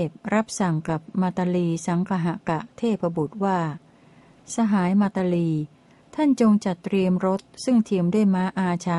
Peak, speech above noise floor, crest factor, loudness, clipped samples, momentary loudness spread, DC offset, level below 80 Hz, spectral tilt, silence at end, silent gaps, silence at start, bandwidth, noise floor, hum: -8 dBFS; 30 dB; 14 dB; -23 LUFS; under 0.1%; 7 LU; under 0.1%; -60 dBFS; -7 dB/octave; 0 s; none; 0 s; 11.5 kHz; -53 dBFS; none